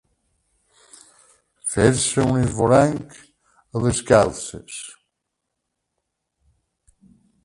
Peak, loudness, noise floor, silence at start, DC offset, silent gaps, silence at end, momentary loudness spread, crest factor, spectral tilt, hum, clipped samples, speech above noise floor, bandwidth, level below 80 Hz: 0 dBFS; -19 LUFS; -79 dBFS; 1.65 s; under 0.1%; none; 2.55 s; 18 LU; 22 dB; -5 dB/octave; none; under 0.1%; 60 dB; 11.5 kHz; -46 dBFS